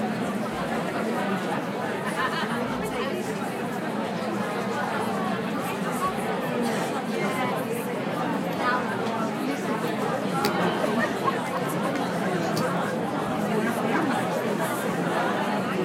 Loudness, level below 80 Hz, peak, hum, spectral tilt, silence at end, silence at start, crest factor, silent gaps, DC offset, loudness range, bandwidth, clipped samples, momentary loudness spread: -27 LUFS; -62 dBFS; -8 dBFS; none; -5.5 dB/octave; 0 s; 0 s; 20 dB; none; under 0.1%; 2 LU; 16 kHz; under 0.1%; 4 LU